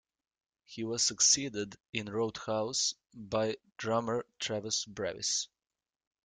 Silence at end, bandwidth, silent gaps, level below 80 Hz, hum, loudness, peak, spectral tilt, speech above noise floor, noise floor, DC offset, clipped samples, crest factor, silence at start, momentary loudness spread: 0.8 s; 11 kHz; 1.89-1.93 s; -70 dBFS; none; -32 LUFS; -12 dBFS; -2 dB/octave; over 56 dB; under -90 dBFS; under 0.1%; under 0.1%; 22 dB; 0.7 s; 14 LU